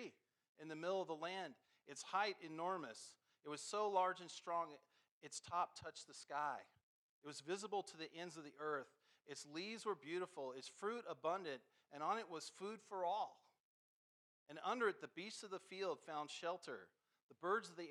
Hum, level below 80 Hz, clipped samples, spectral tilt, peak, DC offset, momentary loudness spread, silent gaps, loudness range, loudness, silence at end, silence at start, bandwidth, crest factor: none; under -90 dBFS; under 0.1%; -3 dB/octave; -26 dBFS; under 0.1%; 14 LU; 0.49-0.55 s, 5.11-5.21 s, 6.83-7.22 s, 13.60-14.46 s, 17.22-17.29 s; 4 LU; -47 LUFS; 0 s; 0 s; 12.5 kHz; 22 dB